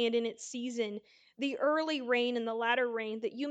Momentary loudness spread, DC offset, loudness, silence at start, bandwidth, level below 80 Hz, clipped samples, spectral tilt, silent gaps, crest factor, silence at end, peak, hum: 8 LU; under 0.1%; -33 LUFS; 0 s; 9.2 kHz; -88 dBFS; under 0.1%; -3 dB/octave; none; 18 dB; 0 s; -16 dBFS; none